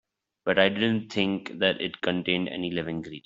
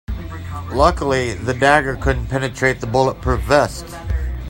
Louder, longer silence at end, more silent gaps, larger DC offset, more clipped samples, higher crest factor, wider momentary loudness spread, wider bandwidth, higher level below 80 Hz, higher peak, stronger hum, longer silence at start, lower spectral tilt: second, -27 LUFS vs -18 LUFS; about the same, 0.05 s vs 0 s; neither; neither; neither; about the same, 22 dB vs 18 dB; second, 8 LU vs 15 LU; second, 7.6 kHz vs 16 kHz; second, -64 dBFS vs -28 dBFS; second, -4 dBFS vs 0 dBFS; neither; first, 0.45 s vs 0.1 s; about the same, -6 dB/octave vs -5.5 dB/octave